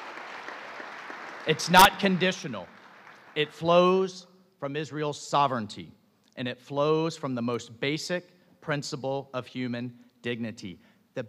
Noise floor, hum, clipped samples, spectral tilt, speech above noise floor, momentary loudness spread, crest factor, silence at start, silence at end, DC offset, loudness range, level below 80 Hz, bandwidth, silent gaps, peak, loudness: -51 dBFS; none; under 0.1%; -4.5 dB/octave; 25 dB; 19 LU; 24 dB; 0 s; 0 s; under 0.1%; 9 LU; -58 dBFS; 15.5 kHz; none; -6 dBFS; -27 LUFS